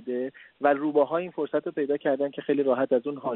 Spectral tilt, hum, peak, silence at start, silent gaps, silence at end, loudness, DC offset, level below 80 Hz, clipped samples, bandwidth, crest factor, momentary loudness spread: -5 dB/octave; none; -8 dBFS; 0 s; none; 0 s; -26 LUFS; under 0.1%; -78 dBFS; under 0.1%; 4.1 kHz; 18 dB; 6 LU